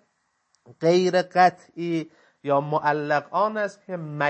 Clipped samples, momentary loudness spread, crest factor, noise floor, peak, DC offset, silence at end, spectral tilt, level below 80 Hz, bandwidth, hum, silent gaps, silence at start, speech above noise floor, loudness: under 0.1%; 14 LU; 20 dB; -72 dBFS; -4 dBFS; under 0.1%; 0 s; -6 dB/octave; -76 dBFS; 8.6 kHz; none; none; 0.7 s; 49 dB; -23 LUFS